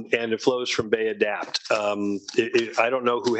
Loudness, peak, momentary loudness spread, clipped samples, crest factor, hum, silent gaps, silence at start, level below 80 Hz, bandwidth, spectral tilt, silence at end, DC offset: -24 LUFS; -6 dBFS; 4 LU; under 0.1%; 18 dB; none; none; 0 s; -64 dBFS; 8.6 kHz; -3.5 dB/octave; 0 s; under 0.1%